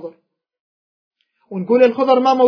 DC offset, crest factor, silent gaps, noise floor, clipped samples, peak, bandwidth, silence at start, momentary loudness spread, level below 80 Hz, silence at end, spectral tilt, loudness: under 0.1%; 16 dB; 0.60-1.11 s; -58 dBFS; under 0.1%; 0 dBFS; 5.4 kHz; 0 s; 18 LU; -76 dBFS; 0 s; -6.5 dB/octave; -14 LUFS